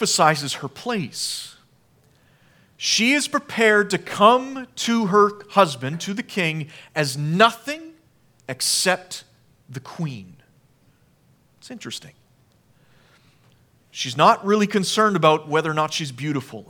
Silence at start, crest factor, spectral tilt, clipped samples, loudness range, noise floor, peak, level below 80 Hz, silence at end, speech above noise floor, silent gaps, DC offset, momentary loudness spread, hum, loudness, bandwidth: 0 s; 22 dB; -3.5 dB/octave; under 0.1%; 18 LU; -59 dBFS; 0 dBFS; -70 dBFS; 0.1 s; 38 dB; none; under 0.1%; 18 LU; none; -20 LUFS; 19 kHz